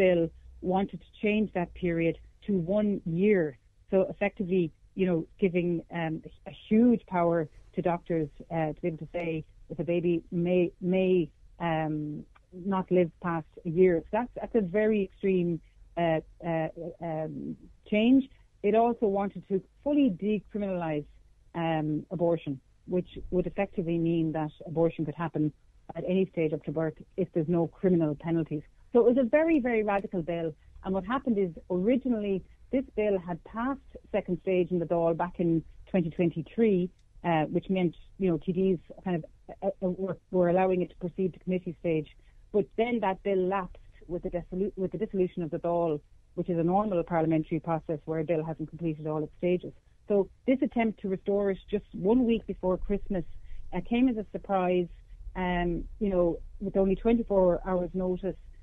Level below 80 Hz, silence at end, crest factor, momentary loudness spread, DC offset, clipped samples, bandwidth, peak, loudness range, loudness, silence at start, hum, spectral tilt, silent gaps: -50 dBFS; 0 s; 16 dB; 10 LU; under 0.1%; under 0.1%; 3.9 kHz; -12 dBFS; 3 LU; -29 LUFS; 0 s; none; -10 dB/octave; none